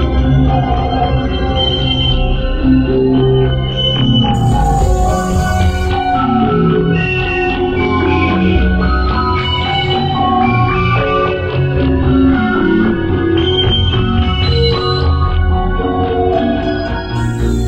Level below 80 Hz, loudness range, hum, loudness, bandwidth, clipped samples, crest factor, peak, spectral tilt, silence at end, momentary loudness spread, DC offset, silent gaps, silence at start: -20 dBFS; 1 LU; none; -13 LUFS; 9.4 kHz; under 0.1%; 12 dB; -2 dBFS; -6.5 dB/octave; 0 s; 4 LU; under 0.1%; none; 0 s